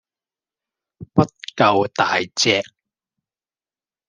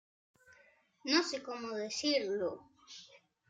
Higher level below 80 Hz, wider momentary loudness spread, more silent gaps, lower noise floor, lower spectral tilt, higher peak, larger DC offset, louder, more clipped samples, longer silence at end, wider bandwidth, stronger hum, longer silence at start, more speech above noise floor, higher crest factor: first, -60 dBFS vs -84 dBFS; second, 6 LU vs 21 LU; neither; first, under -90 dBFS vs -67 dBFS; first, -4 dB/octave vs -2 dB/octave; first, -2 dBFS vs -16 dBFS; neither; first, -19 LUFS vs -35 LUFS; neither; first, 1.45 s vs 0.35 s; first, 10.5 kHz vs 9.4 kHz; neither; first, 1 s vs 0.5 s; first, over 72 dB vs 32 dB; about the same, 22 dB vs 22 dB